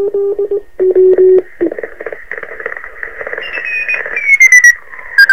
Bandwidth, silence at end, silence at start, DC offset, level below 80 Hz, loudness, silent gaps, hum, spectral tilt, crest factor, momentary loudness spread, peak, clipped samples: 18.5 kHz; 0 s; 0 s; 2%; -48 dBFS; -9 LUFS; none; none; -1.5 dB/octave; 12 dB; 20 LU; 0 dBFS; 1%